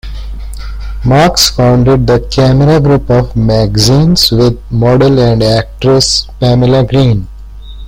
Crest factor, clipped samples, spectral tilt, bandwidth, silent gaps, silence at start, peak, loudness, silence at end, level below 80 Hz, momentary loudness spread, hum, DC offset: 8 dB; under 0.1%; -5.5 dB/octave; 16.5 kHz; none; 0.05 s; 0 dBFS; -8 LUFS; 0 s; -22 dBFS; 15 LU; none; under 0.1%